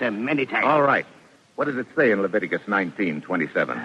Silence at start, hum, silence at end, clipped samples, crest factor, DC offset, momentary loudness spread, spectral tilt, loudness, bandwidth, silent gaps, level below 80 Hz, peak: 0 s; none; 0 s; under 0.1%; 16 dB; under 0.1%; 8 LU; -7 dB/octave; -22 LUFS; 9.6 kHz; none; -72 dBFS; -6 dBFS